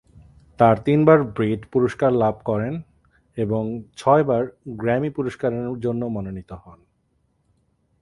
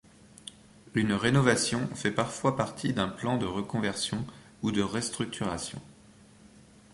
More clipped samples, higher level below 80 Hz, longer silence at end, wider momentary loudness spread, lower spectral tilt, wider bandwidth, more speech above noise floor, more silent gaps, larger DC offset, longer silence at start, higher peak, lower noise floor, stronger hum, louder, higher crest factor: neither; about the same, -52 dBFS vs -56 dBFS; first, 1.3 s vs 0.35 s; about the same, 14 LU vs 16 LU; first, -8.5 dB/octave vs -4.5 dB/octave; about the same, 11.5 kHz vs 11.5 kHz; first, 46 dB vs 27 dB; neither; neither; first, 0.6 s vs 0.45 s; first, 0 dBFS vs -10 dBFS; first, -67 dBFS vs -56 dBFS; neither; first, -21 LUFS vs -29 LUFS; about the same, 20 dB vs 22 dB